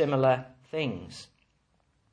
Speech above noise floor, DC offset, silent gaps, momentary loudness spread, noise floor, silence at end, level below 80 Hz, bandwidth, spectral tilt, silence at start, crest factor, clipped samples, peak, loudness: 43 dB; under 0.1%; none; 20 LU; -71 dBFS; 0.9 s; -68 dBFS; 10 kHz; -7 dB/octave; 0 s; 20 dB; under 0.1%; -10 dBFS; -29 LUFS